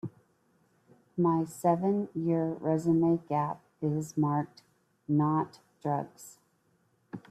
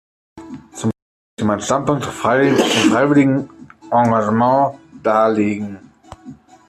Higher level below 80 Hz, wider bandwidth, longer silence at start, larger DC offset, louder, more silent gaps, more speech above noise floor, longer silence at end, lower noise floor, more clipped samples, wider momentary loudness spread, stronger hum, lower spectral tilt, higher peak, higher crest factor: second, -72 dBFS vs -54 dBFS; about the same, 13.5 kHz vs 14 kHz; second, 0.05 s vs 0.35 s; neither; second, -30 LUFS vs -16 LUFS; second, none vs 1.02-1.37 s; first, 42 dB vs 25 dB; second, 0.1 s vs 0.35 s; first, -71 dBFS vs -40 dBFS; neither; about the same, 17 LU vs 16 LU; neither; first, -8.5 dB/octave vs -5.5 dB/octave; second, -14 dBFS vs -2 dBFS; about the same, 16 dB vs 14 dB